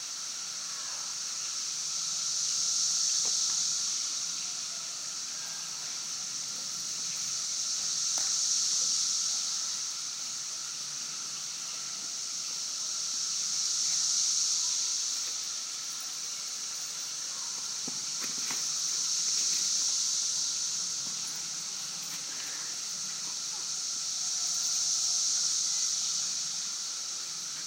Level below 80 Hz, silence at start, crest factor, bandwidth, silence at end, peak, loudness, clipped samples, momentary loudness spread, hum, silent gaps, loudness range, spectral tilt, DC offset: under -90 dBFS; 0 s; 18 dB; 16 kHz; 0 s; -14 dBFS; -29 LUFS; under 0.1%; 8 LU; none; none; 5 LU; 2.5 dB/octave; under 0.1%